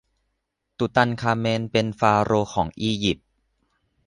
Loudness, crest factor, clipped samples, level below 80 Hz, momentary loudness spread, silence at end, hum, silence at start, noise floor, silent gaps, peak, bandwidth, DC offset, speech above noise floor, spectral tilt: -23 LUFS; 20 dB; under 0.1%; -50 dBFS; 6 LU; 0.9 s; none; 0.8 s; -77 dBFS; none; -4 dBFS; 10.5 kHz; under 0.1%; 56 dB; -5.5 dB/octave